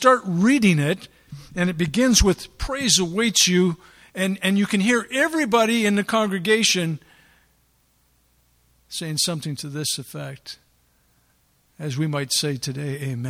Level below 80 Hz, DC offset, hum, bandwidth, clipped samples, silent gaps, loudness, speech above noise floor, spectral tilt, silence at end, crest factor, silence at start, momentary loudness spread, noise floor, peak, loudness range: -40 dBFS; under 0.1%; none; 16 kHz; under 0.1%; none; -21 LUFS; 42 dB; -3.5 dB/octave; 0 s; 20 dB; 0 s; 17 LU; -63 dBFS; -2 dBFS; 9 LU